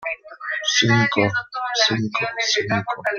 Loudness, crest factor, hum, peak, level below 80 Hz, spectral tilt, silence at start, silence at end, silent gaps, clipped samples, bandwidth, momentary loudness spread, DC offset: -20 LUFS; 18 dB; none; -2 dBFS; -58 dBFS; -3.5 dB/octave; 0 s; 0 s; none; under 0.1%; 7.4 kHz; 10 LU; under 0.1%